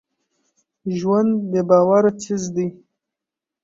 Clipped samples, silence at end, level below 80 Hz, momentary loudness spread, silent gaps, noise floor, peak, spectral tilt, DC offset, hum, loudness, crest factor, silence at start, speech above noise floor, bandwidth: under 0.1%; 0.9 s; -62 dBFS; 13 LU; none; -86 dBFS; -2 dBFS; -7 dB/octave; under 0.1%; none; -19 LUFS; 18 dB; 0.85 s; 69 dB; 7.8 kHz